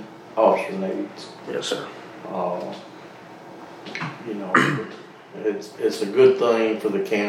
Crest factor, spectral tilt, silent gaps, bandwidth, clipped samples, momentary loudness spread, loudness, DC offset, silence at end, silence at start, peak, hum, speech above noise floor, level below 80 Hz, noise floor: 22 dB; -5 dB/octave; none; 14.5 kHz; under 0.1%; 23 LU; -23 LUFS; under 0.1%; 0 s; 0 s; -2 dBFS; none; 19 dB; -74 dBFS; -42 dBFS